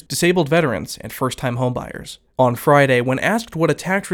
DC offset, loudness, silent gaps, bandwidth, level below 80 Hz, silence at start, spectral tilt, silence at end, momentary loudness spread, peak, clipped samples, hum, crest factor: under 0.1%; -18 LUFS; none; 19 kHz; -50 dBFS; 0.1 s; -5.5 dB/octave; 0 s; 14 LU; -2 dBFS; under 0.1%; none; 18 dB